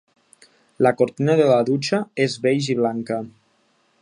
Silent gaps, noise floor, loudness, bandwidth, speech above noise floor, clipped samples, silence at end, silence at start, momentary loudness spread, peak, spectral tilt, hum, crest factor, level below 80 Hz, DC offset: none; -63 dBFS; -20 LUFS; 10.5 kHz; 44 dB; under 0.1%; 0.7 s; 0.8 s; 11 LU; -2 dBFS; -6 dB/octave; none; 18 dB; -68 dBFS; under 0.1%